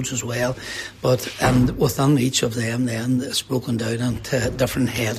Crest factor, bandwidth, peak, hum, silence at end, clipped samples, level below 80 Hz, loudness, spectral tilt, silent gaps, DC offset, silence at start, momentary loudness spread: 16 dB; 14 kHz; -4 dBFS; none; 0 s; under 0.1%; -40 dBFS; -22 LUFS; -5 dB/octave; none; under 0.1%; 0 s; 6 LU